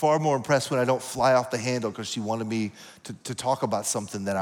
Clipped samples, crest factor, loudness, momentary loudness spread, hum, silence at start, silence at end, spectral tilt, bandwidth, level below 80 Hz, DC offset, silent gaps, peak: under 0.1%; 16 dB; -26 LUFS; 12 LU; none; 0 s; 0 s; -4.5 dB/octave; 18.5 kHz; -64 dBFS; under 0.1%; none; -10 dBFS